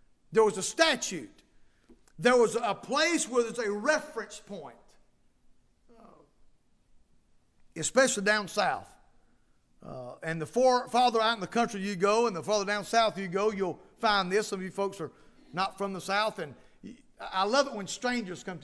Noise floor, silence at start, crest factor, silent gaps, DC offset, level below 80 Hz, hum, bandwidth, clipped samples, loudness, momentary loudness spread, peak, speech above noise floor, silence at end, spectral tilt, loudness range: -65 dBFS; 0.3 s; 22 dB; none; under 0.1%; -64 dBFS; none; 11 kHz; under 0.1%; -28 LUFS; 16 LU; -10 dBFS; 36 dB; 0 s; -3 dB/octave; 6 LU